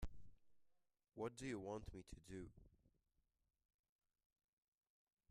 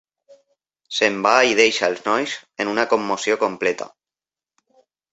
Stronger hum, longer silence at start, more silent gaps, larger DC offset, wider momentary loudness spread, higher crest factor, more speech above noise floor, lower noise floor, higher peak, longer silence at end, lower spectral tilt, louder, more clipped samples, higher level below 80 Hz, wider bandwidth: neither; second, 0 s vs 0.9 s; neither; neither; about the same, 12 LU vs 12 LU; about the same, 22 dB vs 20 dB; second, 28 dB vs over 71 dB; second, -80 dBFS vs under -90 dBFS; second, -34 dBFS vs -2 dBFS; first, 2.45 s vs 1.25 s; first, -6 dB/octave vs -2.5 dB/octave; second, -53 LUFS vs -19 LUFS; neither; about the same, -66 dBFS vs -66 dBFS; first, 12.5 kHz vs 8.2 kHz